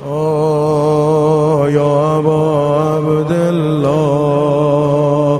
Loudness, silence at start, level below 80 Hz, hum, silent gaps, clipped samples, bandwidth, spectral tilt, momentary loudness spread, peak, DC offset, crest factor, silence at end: -13 LUFS; 0 s; -46 dBFS; none; none; under 0.1%; 12.5 kHz; -8 dB/octave; 2 LU; 0 dBFS; under 0.1%; 12 dB; 0 s